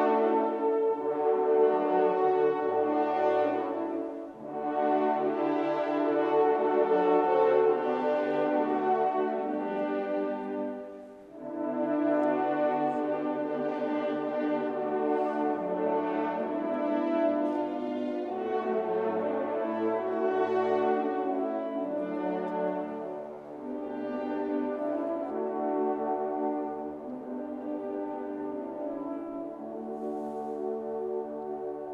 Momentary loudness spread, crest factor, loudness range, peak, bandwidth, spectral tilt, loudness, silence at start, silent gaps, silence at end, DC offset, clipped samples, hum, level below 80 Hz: 11 LU; 16 dB; 8 LU; -14 dBFS; 6 kHz; -8 dB/octave; -30 LUFS; 0 s; none; 0 s; under 0.1%; under 0.1%; none; -74 dBFS